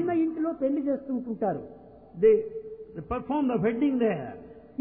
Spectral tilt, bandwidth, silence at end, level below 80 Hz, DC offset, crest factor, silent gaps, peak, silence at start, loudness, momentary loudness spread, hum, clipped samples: -11.5 dB/octave; 3.5 kHz; 0.15 s; -56 dBFS; under 0.1%; 16 dB; none; -10 dBFS; 0 s; -27 LUFS; 19 LU; none; under 0.1%